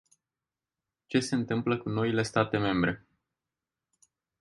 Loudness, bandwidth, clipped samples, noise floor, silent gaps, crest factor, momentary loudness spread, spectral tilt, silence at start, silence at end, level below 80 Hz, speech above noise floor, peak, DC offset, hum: -29 LUFS; 11.5 kHz; under 0.1%; under -90 dBFS; none; 22 dB; 4 LU; -6 dB/octave; 1.1 s; 1.45 s; -60 dBFS; over 62 dB; -10 dBFS; under 0.1%; none